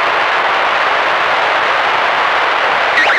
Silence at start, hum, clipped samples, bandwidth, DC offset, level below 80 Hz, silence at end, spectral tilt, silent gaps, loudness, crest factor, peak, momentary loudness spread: 0 s; none; under 0.1%; 16 kHz; under 0.1%; -54 dBFS; 0 s; -1.5 dB/octave; none; -12 LUFS; 12 dB; -2 dBFS; 1 LU